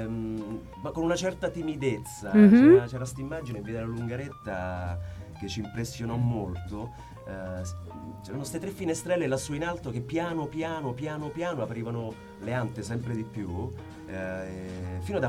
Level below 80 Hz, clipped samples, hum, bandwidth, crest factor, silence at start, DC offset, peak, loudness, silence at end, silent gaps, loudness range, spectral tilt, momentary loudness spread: -50 dBFS; under 0.1%; none; 14 kHz; 22 dB; 0 s; under 0.1%; -6 dBFS; -28 LUFS; 0 s; none; 12 LU; -6.5 dB/octave; 13 LU